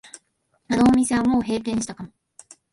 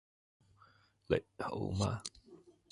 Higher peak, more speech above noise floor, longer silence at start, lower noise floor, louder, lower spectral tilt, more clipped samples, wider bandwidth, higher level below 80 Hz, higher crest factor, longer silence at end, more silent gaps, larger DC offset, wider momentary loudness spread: first, -6 dBFS vs -16 dBFS; first, 49 dB vs 30 dB; second, 0.7 s vs 1.1 s; about the same, -69 dBFS vs -67 dBFS; first, -21 LUFS vs -38 LUFS; about the same, -5 dB/octave vs -5.5 dB/octave; neither; about the same, 11.5 kHz vs 11.5 kHz; first, -48 dBFS vs -56 dBFS; second, 16 dB vs 24 dB; first, 0.65 s vs 0.35 s; neither; neither; first, 18 LU vs 7 LU